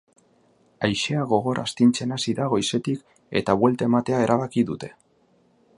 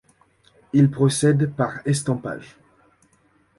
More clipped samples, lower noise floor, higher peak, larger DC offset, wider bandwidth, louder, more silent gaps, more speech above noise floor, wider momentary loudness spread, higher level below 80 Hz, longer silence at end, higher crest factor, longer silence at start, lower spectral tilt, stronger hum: neither; about the same, -62 dBFS vs -61 dBFS; about the same, -4 dBFS vs -6 dBFS; neither; about the same, 11.5 kHz vs 11.5 kHz; about the same, -23 LUFS vs -21 LUFS; neither; about the same, 40 dB vs 41 dB; second, 8 LU vs 11 LU; about the same, -58 dBFS vs -58 dBFS; second, 0.85 s vs 1.15 s; about the same, 20 dB vs 18 dB; about the same, 0.8 s vs 0.75 s; about the same, -5.5 dB/octave vs -6 dB/octave; neither